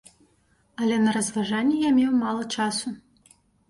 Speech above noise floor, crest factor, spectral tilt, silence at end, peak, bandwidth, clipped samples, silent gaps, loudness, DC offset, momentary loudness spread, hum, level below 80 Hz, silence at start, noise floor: 41 dB; 14 dB; -4 dB/octave; 0.7 s; -12 dBFS; 11.5 kHz; under 0.1%; none; -24 LUFS; under 0.1%; 12 LU; none; -64 dBFS; 0.8 s; -64 dBFS